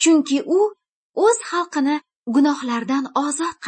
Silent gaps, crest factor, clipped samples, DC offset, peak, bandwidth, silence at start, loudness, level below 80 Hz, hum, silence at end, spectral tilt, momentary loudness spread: 0.89-1.14 s, 2.16-2.24 s; 14 dB; under 0.1%; under 0.1%; -4 dBFS; 8.8 kHz; 0 s; -20 LUFS; -74 dBFS; none; 0 s; -2.5 dB/octave; 5 LU